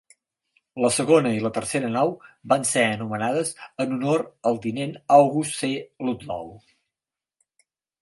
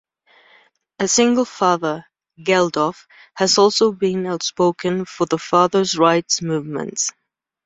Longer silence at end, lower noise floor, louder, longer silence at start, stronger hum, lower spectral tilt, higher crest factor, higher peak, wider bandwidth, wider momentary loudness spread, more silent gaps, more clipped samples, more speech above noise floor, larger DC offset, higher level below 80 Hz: first, 1.45 s vs 0.55 s; first, -90 dBFS vs -55 dBFS; second, -23 LUFS vs -18 LUFS; second, 0.75 s vs 1 s; neither; about the same, -4.5 dB/octave vs -3.5 dB/octave; about the same, 20 dB vs 18 dB; about the same, -4 dBFS vs -2 dBFS; first, 11.5 kHz vs 8.4 kHz; first, 12 LU vs 9 LU; neither; neither; first, 67 dB vs 37 dB; neither; about the same, -64 dBFS vs -62 dBFS